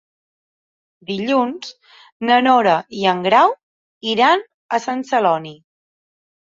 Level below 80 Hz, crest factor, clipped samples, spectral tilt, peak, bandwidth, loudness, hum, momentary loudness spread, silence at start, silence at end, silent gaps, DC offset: -68 dBFS; 18 dB; under 0.1%; -4.5 dB/octave; -2 dBFS; 7.6 kHz; -17 LUFS; none; 17 LU; 1.1 s; 0.95 s; 2.12-2.20 s, 3.63-4.01 s, 4.54-4.69 s; under 0.1%